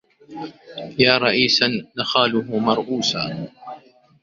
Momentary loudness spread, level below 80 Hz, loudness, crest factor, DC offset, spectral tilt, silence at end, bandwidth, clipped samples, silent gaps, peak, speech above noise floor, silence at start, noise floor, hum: 20 LU; -58 dBFS; -18 LUFS; 20 dB; under 0.1%; -4 dB/octave; 0.45 s; 7.6 kHz; under 0.1%; none; -2 dBFS; 24 dB; 0.3 s; -44 dBFS; none